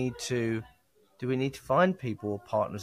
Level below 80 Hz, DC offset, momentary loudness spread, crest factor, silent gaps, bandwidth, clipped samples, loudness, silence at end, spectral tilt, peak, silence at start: -62 dBFS; under 0.1%; 10 LU; 18 dB; none; 15.5 kHz; under 0.1%; -30 LUFS; 0 s; -6 dB/octave; -12 dBFS; 0 s